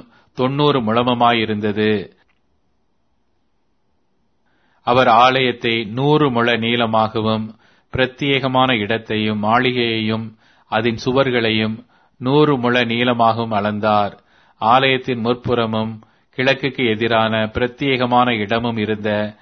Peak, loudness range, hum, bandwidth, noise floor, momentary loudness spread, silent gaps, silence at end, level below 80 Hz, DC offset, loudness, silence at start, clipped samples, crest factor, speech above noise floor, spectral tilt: 0 dBFS; 3 LU; none; 6.4 kHz; -68 dBFS; 9 LU; none; 0.1 s; -50 dBFS; under 0.1%; -17 LUFS; 0.35 s; under 0.1%; 18 dB; 51 dB; -7 dB/octave